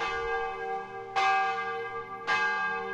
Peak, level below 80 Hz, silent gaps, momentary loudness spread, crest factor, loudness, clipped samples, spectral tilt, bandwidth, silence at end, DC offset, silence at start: -14 dBFS; -58 dBFS; none; 10 LU; 16 dB; -30 LUFS; under 0.1%; -2.5 dB/octave; 10.5 kHz; 0 s; under 0.1%; 0 s